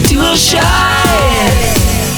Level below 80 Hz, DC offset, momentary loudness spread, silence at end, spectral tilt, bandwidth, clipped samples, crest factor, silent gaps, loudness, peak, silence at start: -18 dBFS; under 0.1%; 3 LU; 0 s; -3.5 dB/octave; over 20 kHz; under 0.1%; 10 dB; none; -9 LUFS; 0 dBFS; 0 s